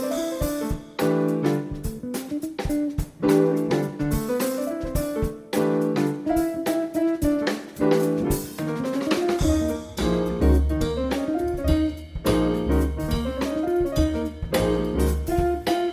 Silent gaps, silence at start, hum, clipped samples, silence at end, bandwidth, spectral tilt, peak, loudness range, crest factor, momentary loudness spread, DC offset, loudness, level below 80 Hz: none; 0 s; none; under 0.1%; 0 s; 16 kHz; -6.5 dB/octave; -8 dBFS; 1 LU; 16 dB; 6 LU; under 0.1%; -24 LUFS; -32 dBFS